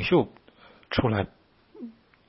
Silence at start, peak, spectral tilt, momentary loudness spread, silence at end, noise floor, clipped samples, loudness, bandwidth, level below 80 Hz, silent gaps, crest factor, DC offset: 0 s; -8 dBFS; -10.5 dB/octave; 20 LU; 0.4 s; -55 dBFS; under 0.1%; -27 LUFS; 5.8 kHz; -50 dBFS; none; 20 dB; under 0.1%